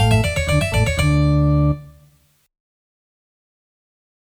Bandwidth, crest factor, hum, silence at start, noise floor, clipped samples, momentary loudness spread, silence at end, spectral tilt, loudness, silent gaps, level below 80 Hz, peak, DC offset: 16 kHz; 16 dB; none; 0 s; -55 dBFS; under 0.1%; 3 LU; 2.45 s; -6 dB/octave; -18 LUFS; none; -28 dBFS; -4 dBFS; under 0.1%